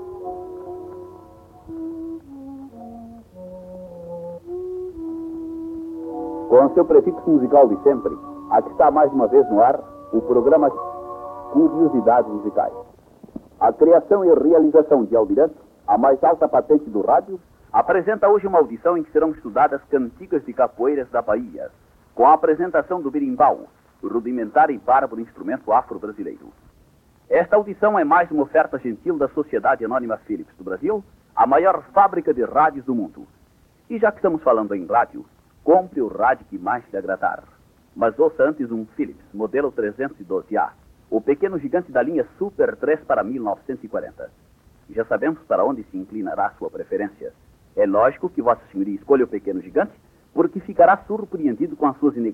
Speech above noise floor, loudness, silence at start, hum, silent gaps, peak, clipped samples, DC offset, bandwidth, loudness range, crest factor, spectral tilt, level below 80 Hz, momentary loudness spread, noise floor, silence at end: 37 dB; -19 LUFS; 0 s; none; none; -2 dBFS; under 0.1%; under 0.1%; 4.1 kHz; 8 LU; 18 dB; -9 dB/octave; -56 dBFS; 18 LU; -55 dBFS; 0 s